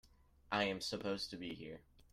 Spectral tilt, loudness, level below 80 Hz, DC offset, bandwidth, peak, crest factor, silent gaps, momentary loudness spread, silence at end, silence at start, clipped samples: -4 dB/octave; -41 LUFS; -68 dBFS; under 0.1%; 15.5 kHz; -22 dBFS; 22 dB; none; 14 LU; 0.1 s; 0.05 s; under 0.1%